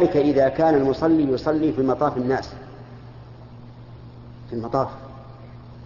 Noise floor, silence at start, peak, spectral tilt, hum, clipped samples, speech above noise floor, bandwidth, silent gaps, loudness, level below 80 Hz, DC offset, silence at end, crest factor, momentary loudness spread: -41 dBFS; 0 s; -6 dBFS; -6.5 dB/octave; none; under 0.1%; 21 dB; 7.2 kHz; none; -21 LUFS; -48 dBFS; under 0.1%; 0 s; 16 dB; 24 LU